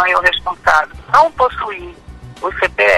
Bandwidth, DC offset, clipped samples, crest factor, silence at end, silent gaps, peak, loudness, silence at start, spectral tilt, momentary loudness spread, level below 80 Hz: 16 kHz; under 0.1%; under 0.1%; 14 dB; 0 s; none; 0 dBFS; -15 LUFS; 0 s; -3 dB/octave; 13 LU; -38 dBFS